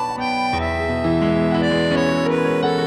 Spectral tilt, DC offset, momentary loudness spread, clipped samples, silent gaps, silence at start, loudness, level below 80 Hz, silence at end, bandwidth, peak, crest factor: -6.5 dB/octave; under 0.1%; 3 LU; under 0.1%; none; 0 s; -19 LUFS; -38 dBFS; 0 s; 12 kHz; -6 dBFS; 12 dB